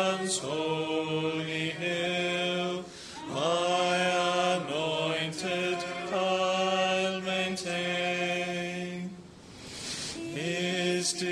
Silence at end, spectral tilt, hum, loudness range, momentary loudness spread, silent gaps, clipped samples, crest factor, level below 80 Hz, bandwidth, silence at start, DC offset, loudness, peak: 0 s; -3.5 dB/octave; none; 4 LU; 10 LU; none; under 0.1%; 16 dB; -68 dBFS; 14 kHz; 0 s; under 0.1%; -29 LUFS; -14 dBFS